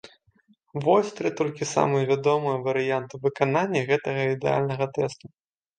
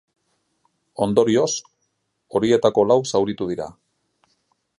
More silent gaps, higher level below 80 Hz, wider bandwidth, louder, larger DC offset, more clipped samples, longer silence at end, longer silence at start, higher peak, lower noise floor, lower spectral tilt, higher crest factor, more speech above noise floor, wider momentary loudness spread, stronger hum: neither; second, -68 dBFS vs -58 dBFS; second, 9.4 kHz vs 11.5 kHz; second, -25 LUFS vs -20 LUFS; neither; neither; second, 0.5 s vs 1.1 s; second, 0.05 s vs 1 s; about the same, -6 dBFS vs -4 dBFS; second, -63 dBFS vs -72 dBFS; about the same, -6 dB/octave vs -5 dB/octave; about the same, 20 dB vs 18 dB; second, 39 dB vs 54 dB; second, 7 LU vs 12 LU; neither